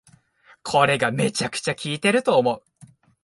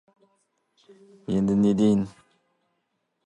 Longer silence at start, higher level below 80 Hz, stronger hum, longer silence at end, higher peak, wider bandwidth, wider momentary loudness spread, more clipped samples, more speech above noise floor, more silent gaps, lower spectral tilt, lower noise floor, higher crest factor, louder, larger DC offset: second, 0.65 s vs 1.3 s; about the same, -62 dBFS vs -58 dBFS; neither; second, 0.65 s vs 1.15 s; first, -2 dBFS vs -10 dBFS; first, 11.5 kHz vs 9 kHz; second, 8 LU vs 15 LU; neither; second, 35 dB vs 53 dB; neither; second, -4 dB/octave vs -8.5 dB/octave; second, -56 dBFS vs -76 dBFS; about the same, 20 dB vs 16 dB; about the same, -21 LUFS vs -23 LUFS; neither